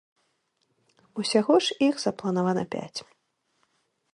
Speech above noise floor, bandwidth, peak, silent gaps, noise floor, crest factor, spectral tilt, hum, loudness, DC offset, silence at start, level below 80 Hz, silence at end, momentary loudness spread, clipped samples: 49 dB; 11.5 kHz; -8 dBFS; none; -73 dBFS; 20 dB; -5 dB/octave; none; -25 LUFS; under 0.1%; 1.15 s; -72 dBFS; 1.1 s; 16 LU; under 0.1%